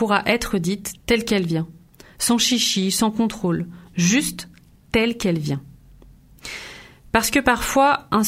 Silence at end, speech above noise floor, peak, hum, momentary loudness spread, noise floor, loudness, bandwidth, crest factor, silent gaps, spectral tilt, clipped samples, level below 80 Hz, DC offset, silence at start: 0 s; 28 dB; -2 dBFS; none; 16 LU; -48 dBFS; -20 LUFS; 16 kHz; 20 dB; none; -3.5 dB/octave; under 0.1%; -44 dBFS; under 0.1%; 0 s